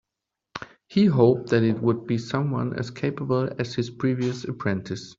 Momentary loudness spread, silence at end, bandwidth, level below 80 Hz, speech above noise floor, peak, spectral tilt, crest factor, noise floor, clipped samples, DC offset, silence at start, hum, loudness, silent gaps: 10 LU; 0.05 s; 7.8 kHz; -60 dBFS; 62 dB; -4 dBFS; -7.5 dB/octave; 20 dB; -85 dBFS; under 0.1%; under 0.1%; 0.55 s; none; -24 LUFS; none